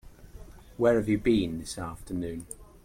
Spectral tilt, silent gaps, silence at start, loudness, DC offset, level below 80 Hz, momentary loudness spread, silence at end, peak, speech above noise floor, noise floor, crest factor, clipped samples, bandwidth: -6 dB/octave; none; 0.05 s; -28 LUFS; under 0.1%; -48 dBFS; 16 LU; 0.2 s; -12 dBFS; 20 dB; -47 dBFS; 18 dB; under 0.1%; 16.5 kHz